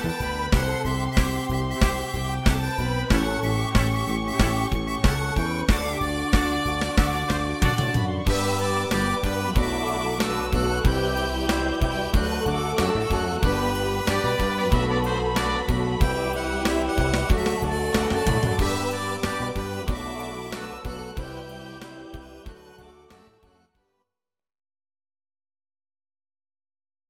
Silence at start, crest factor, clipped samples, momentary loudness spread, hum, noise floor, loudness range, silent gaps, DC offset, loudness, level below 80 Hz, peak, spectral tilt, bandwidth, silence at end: 0 s; 20 dB; under 0.1%; 10 LU; none; -86 dBFS; 9 LU; none; under 0.1%; -24 LUFS; -30 dBFS; -4 dBFS; -5 dB/octave; 17 kHz; 4.25 s